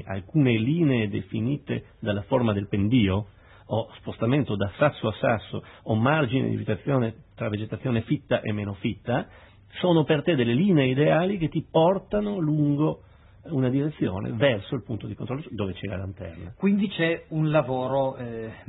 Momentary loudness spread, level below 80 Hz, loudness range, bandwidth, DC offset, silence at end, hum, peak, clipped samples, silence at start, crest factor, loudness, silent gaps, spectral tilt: 11 LU; -54 dBFS; 5 LU; 4.1 kHz; under 0.1%; 0.05 s; none; -6 dBFS; under 0.1%; 0 s; 18 dB; -25 LUFS; none; -11.5 dB/octave